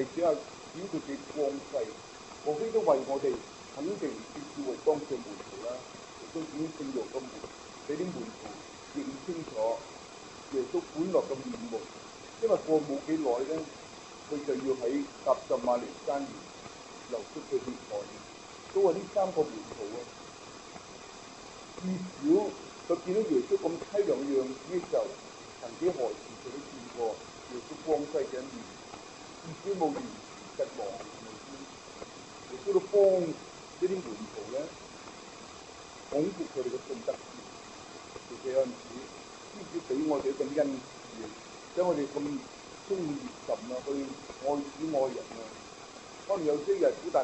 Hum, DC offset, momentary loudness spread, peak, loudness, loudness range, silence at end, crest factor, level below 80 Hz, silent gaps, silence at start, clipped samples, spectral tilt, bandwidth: none; under 0.1%; 17 LU; -12 dBFS; -33 LUFS; 6 LU; 0 s; 20 dB; -68 dBFS; none; 0 s; under 0.1%; -5 dB/octave; 8.4 kHz